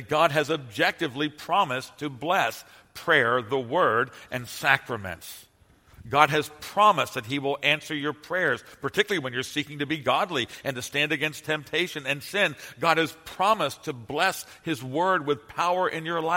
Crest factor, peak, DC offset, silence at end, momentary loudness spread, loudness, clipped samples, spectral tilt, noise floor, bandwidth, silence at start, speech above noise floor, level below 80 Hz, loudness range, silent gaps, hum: 26 dB; -2 dBFS; under 0.1%; 0 s; 11 LU; -25 LUFS; under 0.1%; -4 dB/octave; -57 dBFS; 16.5 kHz; 0 s; 31 dB; -64 dBFS; 2 LU; none; none